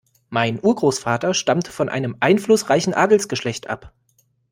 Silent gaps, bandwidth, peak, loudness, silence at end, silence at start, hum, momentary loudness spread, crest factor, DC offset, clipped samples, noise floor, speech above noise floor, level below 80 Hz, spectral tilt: none; 16.5 kHz; -2 dBFS; -19 LUFS; 0.65 s; 0.3 s; none; 10 LU; 18 dB; under 0.1%; under 0.1%; -63 dBFS; 44 dB; -58 dBFS; -4.5 dB/octave